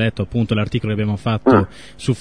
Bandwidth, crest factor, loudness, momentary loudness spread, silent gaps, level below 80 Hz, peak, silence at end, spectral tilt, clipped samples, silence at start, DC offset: 10 kHz; 16 dB; -19 LUFS; 9 LU; none; -42 dBFS; -2 dBFS; 0 s; -7.5 dB/octave; under 0.1%; 0 s; 0.8%